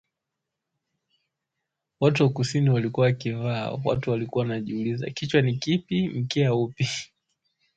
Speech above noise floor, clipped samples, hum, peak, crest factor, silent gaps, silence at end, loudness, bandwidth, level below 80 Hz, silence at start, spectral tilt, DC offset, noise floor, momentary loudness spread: 60 dB; under 0.1%; none; -6 dBFS; 20 dB; none; 0.7 s; -25 LUFS; 8.8 kHz; -58 dBFS; 2 s; -6.5 dB/octave; under 0.1%; -84 dBFS; 6 LU